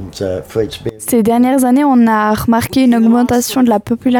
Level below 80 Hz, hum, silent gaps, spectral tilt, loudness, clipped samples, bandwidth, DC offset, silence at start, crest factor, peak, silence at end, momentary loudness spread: -42 dBFS; none; none; -5 dB/octave; -12 LUFS; under 0.1%; 19.5 kHz; under 0.1%; 0 s; 10 dB; -2 dBFS; 0 s; 10 LU